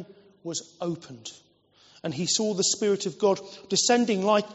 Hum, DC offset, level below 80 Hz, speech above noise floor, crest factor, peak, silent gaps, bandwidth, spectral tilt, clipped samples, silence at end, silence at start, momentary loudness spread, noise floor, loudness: none; under 0.1%; -72 dBFS; 32 dB; 18 dB; -8 dBFS; none; 8 kHz; -3.5 dB/octave; under 0.1%; 0 s; 0 s; 17 LU; -59 dBFS; -25 LUFS